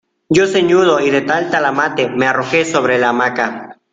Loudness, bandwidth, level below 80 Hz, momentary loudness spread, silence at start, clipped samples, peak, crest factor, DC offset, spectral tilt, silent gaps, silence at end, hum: -14 LUFS; 9 kHz; -54 dBFS; 5 LU; 0.3 s; under 0.1%; 0 dBFS; 14 dB; under 0.1%; -4.5 dB/octave; none; 0.2 s; none